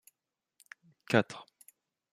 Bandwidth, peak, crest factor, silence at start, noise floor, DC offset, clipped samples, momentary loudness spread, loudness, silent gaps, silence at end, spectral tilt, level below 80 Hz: 15.5 kHz; -10 dBFS; 26 dB; 1.1 s; -88 dBFS; under 0.1%; under 0.1%; 25 LU; -31 LUFS; none; 0.7 s; -5.5 dB/octave; -74 dBFS